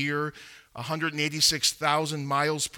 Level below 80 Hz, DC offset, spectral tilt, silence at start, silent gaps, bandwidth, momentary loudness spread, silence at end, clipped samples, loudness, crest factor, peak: -62 dBFS; under 0.1%; -2.5 dB/octave; 0 s; none; 19 kHz; 13 LU; 0 s; under 0.1%; -25 LUFS; 20 dB; -8 dBFS